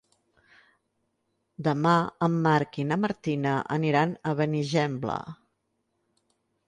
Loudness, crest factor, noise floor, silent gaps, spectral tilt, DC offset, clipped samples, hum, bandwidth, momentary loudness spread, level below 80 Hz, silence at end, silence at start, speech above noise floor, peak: -26 LUFS; 18 dB; -77 dBFS; none; -7 dB/octave; under 0.1%; under 0.1%; none; 9.6 kHz; 8 LU; -66 dBFS; 1.35 s; 1.6 s; 51 dB; -10 dBFS